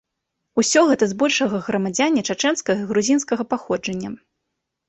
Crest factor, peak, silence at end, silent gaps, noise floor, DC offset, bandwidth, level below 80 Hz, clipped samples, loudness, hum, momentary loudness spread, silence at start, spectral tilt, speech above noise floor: 18 dB; -2 dBFS; 0.75 s; none; -79 dBFS; under 0.1%; 8.4 kHz; -60 dBFS; under 0.1%; -20 LUFS; none; 10 LU; 0.55 s; -3.5 dB/octave; 59 dB